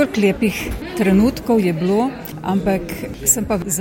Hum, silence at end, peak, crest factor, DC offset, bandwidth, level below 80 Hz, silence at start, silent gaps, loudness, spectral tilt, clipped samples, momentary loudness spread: none; 0 s; -2 dBFS; 16 dB; under 0.1%; 17 kHz; -36 dBFS; 0 s; none; -18 LUFS; -5 dB/octave; under 0.1%; 9 LU